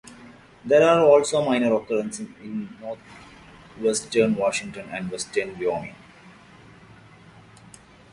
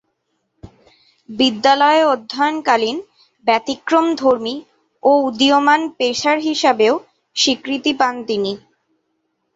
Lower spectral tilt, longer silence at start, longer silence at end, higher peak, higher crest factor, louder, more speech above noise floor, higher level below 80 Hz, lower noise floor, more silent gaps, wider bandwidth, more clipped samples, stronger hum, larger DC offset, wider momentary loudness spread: first, -4.5 dB/octave vs -2.5 dB/octave; second, 0.05 s vs 0.65 s; first, 1.85 s vs 1 s; about the same, -4 dBFS vs -2 dBFS; about the same, 20 dB vs 16 dB; second, -22 LUFS vs -16 LUFS; second, 27 dB vs 54 dB; about the same, -60 dBFS vs -60 dBFS; second, -49 dBFS vs -70 dBFS; neither; first, 11.5 kHz vs 8 kHz; neither; neither; neither; first, 19 LU vs 10 LU